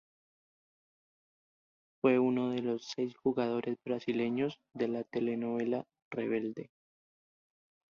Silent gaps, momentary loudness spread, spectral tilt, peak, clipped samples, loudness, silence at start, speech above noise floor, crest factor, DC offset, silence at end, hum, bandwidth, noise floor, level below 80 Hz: 6.02-6.11 s; 9 LU; -6.5 dB/octave; -16 dBFS; under 0.1%; -34 LUFS; 2.05 s; over 56 dB; 20 dB; under 0.1%; 1.3 s; none; 7 kHz; under -90 dBFS; -78 dBFS